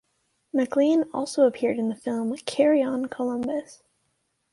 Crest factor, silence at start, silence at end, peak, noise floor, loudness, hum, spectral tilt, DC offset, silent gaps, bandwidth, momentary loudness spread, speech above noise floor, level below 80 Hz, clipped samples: 18 dB; 0.55 s; 0.8 s; -8 dBFS; -73 dBFS; -25 LUFS; none; -5 dB/octave; under 0.1%; none; 11.5 kHz; 8 LU; 50 dB; -70 dBFS; under 0.1%